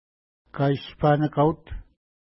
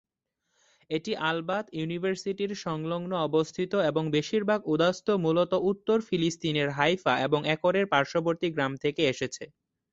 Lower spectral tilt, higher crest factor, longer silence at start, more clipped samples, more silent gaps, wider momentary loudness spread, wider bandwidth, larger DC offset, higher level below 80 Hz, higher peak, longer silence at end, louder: first, -12 dB/octave vs -5.5 dB/octave; about the same, 18 dB vs 20 dB; second, 0.55 s vs 0.9 s; neither; neither; first, 21 LU vs 7 LU; second, 5.8 kHz vs 8 kHz; neither; first, -46 dBFS vs -66 dBFS; about the same, -8 dBFS vs -8 dBFS; about the same, 0.45 s vs 0.45 s; first, -23 LUFS vs -28 LUFS